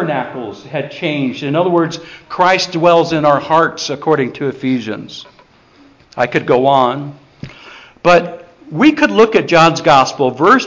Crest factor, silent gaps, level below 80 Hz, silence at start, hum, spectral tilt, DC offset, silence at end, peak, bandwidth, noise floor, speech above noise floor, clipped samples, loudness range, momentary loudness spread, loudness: 14 dB; none; -52 dBFS; 0 s; none; -5 dB/octave; under 0.1%; 0 s; 0 dBFS; 7.6 kHz; -46 dBFS; 33 dB; under 0.1%; 5 LU; 18 LU; -13 LUFS